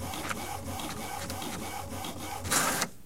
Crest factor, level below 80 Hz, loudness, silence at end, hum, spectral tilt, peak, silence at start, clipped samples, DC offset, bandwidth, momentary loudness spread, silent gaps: 24 dB; -52 dBFS; -33 LUFS; 0 s; none; -2.5 dB/octave; -10 dBFS; 0 s; under 0.1%; 0.5%; 16.5 kHz; 11 LU; none